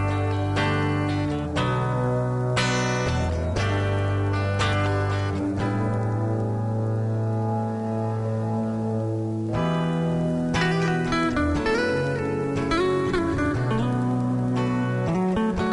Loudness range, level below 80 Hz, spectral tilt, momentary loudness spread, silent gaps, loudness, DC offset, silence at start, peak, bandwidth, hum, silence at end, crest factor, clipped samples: 2 LU; -42 dBFS; -6.5 dB/octave; 4 LU; none; -24 LUFS; under 0.1%; 0 s; -12 dBFS; 11 kHz; none; 0 s; 12 dB; under 0.1%